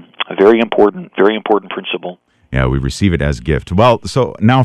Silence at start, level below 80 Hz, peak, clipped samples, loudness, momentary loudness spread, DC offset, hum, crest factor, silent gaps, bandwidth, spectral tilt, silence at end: 0.2 s; -30 dBFS; 0 dBFS; under 0.1%; -14 LUFS; 11 LU; under 0.1%; none; 14 dB; none; 11.5 kHz; -6.5 dB/octave; 0 s